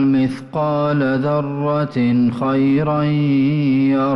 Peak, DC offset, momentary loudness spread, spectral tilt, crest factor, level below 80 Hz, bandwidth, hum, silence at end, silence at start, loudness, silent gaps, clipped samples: -8 dBFS; under 0.1%; 4 LU; -9.5 dB/octave; 8 dB; -52 dBFS; 5.8 kHz; none; 0 s; 0 s; -17 LUFS; none; under 0.1%